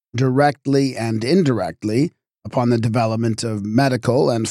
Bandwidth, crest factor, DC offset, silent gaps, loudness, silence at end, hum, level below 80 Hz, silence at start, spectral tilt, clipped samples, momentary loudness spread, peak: 13.5 kHz; 14 dB; under 0.1%; none; -19 LUFS; 0 s; none; -58 dBFS; 0.15 s; -6.5 dB/octave; under 0.1%; 6 LU; -4 dBFS